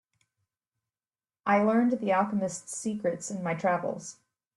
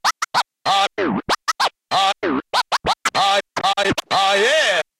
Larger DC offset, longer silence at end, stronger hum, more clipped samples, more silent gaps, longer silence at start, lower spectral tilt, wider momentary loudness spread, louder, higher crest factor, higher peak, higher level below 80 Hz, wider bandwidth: neither; first, 0.45 s vs 0.2 s; neither; neither; neither; first, 1.45 s vs 0.05 s; first, -5.5 dB/octave vs -2 dB/octave; first, 11 LU vs 6 LU; second, -28 LUFS vs -18 LUFS; about the same, 18 dB vs 14 dB; second, -12 dBFS vs -4 dBFS; second, -74 dBFS vs -54 dBFS; second, 12 kHz vs 16.5 kHz